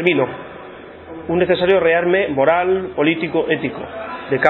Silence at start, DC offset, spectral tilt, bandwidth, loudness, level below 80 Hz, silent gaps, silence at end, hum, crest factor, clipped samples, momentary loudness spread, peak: 0 s; under 0.1%; -4 dB/octave; 4.2 kHz; -17 LUFS; -50 dBFS; none; 0 s; none; 18 dB; under 0.1%; 20 LU; 0 dBFS